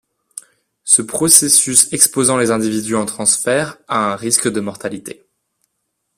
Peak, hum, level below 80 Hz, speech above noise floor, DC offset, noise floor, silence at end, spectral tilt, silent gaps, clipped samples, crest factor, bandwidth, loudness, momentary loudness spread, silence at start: 0 dBFS; none; -56 dBFS; 57 dB; under 0.1%; -72 dBFS; 1.05 s; -2 dB/octave; none; 0.1%; 16 dB; over 20 kHz; -13 LUFS; 22 LU; 0.35 s